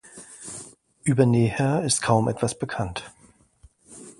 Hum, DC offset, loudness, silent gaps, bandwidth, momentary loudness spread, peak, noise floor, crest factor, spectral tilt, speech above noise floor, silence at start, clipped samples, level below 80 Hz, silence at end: none; under 0.1%; -23 LUFS; none; 11.5 kHz; 19 LU; -4 dBFS; -57 dBFS; 20 dB; -5.5 dB/octave; 35 dB; 0.15 s; under 0.1%; -52 dBFS; 0.1 s